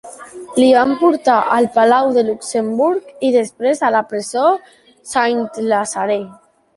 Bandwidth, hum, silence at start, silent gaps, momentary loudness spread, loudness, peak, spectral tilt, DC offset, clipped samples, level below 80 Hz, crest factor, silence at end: 11.5 kHz; none; 0.05 s; none; 10 LU; -16 LUFS; -2 dBFS; -4 dB/octave; under 0.1%; under 0.1%; -62 dBFS; 14 dB; 0.45 s